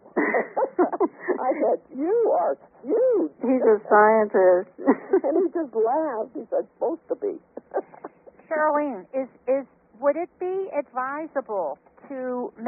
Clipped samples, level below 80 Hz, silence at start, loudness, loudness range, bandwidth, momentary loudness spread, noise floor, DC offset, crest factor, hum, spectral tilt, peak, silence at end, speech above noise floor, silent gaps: under 0.1%; -74 dBFS; 0.15 s; -24 LUFS; 8 LU; 2.9 kHz; 13 LU; -45 dBFS; under 0.1%; 20 dB; none; 0.5 dB/octave; -4 dBFS; 0 s; 21 dB; none